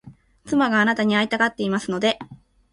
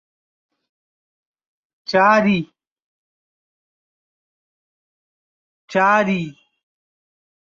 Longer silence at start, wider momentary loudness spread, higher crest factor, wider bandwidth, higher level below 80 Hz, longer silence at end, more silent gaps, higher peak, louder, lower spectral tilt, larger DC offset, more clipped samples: second, 0.05 s vs 1.9 s; second, 6 LU vs 19 LU; second, 16 dB vs 22 dB; first, 11 kHz vs 7.4 kHz; about the same, -60 dBFS vs -64 dBFS; second, 0.35 s vs 1.15 s; second, none vs 2.67-2.76 s, 2.82-5.68 s; second, -6 dBFS vs -2 dBFS; second, -21 LUFS vs -17 LUFS; about the same, -5 dB/octave vs -6 dB/octave; neither; neither